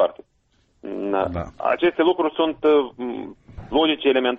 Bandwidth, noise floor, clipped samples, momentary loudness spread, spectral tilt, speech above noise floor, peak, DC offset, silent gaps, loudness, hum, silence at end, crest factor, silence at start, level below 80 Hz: 6.2 kHz; -64 dBFS; under 0.1%; 15 LU; -7.5 dB/octave; 44 dB; -8 dBFS; under 0.1%; none; -21 LUFS; none; 0 s; 14 dB; 0 s; -48 dBFS